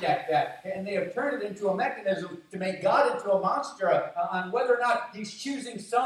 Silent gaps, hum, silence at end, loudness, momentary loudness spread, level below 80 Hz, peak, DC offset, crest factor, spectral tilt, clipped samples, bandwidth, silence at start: none; none; 0 s; -28 LUFS; 10 LU; -74 dBFS; -12 dBFS; under 0.1%; 16 dB; -5 dB/octave; under 0.1%; 12 kHz; 0 s